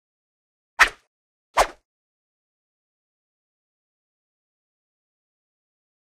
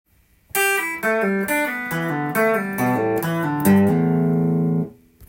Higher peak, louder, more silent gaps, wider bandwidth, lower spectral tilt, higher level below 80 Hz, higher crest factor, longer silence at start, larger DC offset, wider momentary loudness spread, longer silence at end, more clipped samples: first, -2 dBFS vs -6 dBFS; about the same, -21 LUFS vs -20 LUFS; first, 1.07-1.54 s vs none; second, 13.5 kHz vs 17 kHz; second, -0.5 dB/octave vs -6 dB/octave; first, -50 dBFS vs -58 dBFS; first, 30 dB vs 16 dB; first, 0.8 s vs 0.55 s; neither; about the same, 9 LU vs 7 LU; first, 4.45 s vs 0.05 s; neither